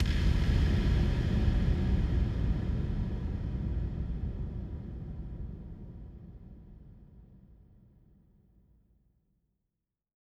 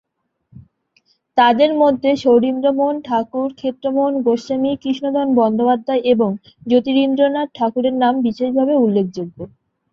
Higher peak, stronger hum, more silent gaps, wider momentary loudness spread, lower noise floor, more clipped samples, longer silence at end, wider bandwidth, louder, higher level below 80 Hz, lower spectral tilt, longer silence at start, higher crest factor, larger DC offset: second, -16 dBFS vs -2 dBFS; neither; neither; first, 20 LU vs 8 LU; first, -86 dBFS vs -61 dBFS; neither; first, 2.9 s vs 0.45 s; first, 7.8 kHz vs 7 kHz; second, -32 LUFS vs -17 LUFS; first, -34 dBFS vs -60 dBFS; about the same, -8 dB/octave vs -7 dB/octave; second, 0 s vs 0.55 s; about the same, 18 dB vs 16 dB; neither